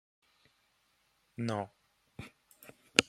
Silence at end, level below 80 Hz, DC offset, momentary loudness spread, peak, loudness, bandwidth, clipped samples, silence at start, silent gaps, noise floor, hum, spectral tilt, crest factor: 0.05 s; -72 dBFS; under 0.1%; 21 LU; -2 dBFS; -35 LUFS; 16 kHz; under 0.1%; 1.4 s; none; -74 dBFS; none; -2.5 dB/octave; 38 dB